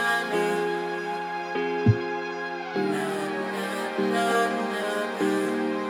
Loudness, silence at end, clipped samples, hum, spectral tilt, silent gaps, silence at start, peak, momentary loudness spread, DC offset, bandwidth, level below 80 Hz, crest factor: -27 LUFS; 0 s; under 0.1%; none; -5.5 dB/octave; none; 0 s; -8 dBFS; 7 LU; under 0.1%; 19 kHz; -62 dBFS; 18 dB